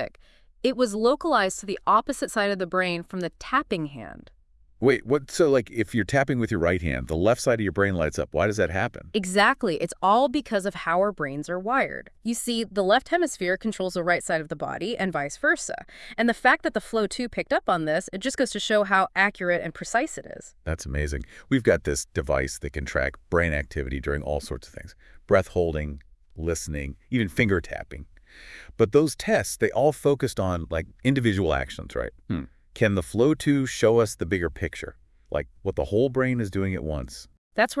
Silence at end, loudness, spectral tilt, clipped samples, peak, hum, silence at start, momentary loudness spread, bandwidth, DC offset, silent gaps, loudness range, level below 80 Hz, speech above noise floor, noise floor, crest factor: 0 s; -25 LUFS; -5 dB/octave; under 0.1%; -6 dBFS; none; 0 s; 11 LU; 12 kHz; under 0.1%; 37.38-37.51 s; 4 LU; -44 dBFS; 30 dB; -54 dBFS; 20 dB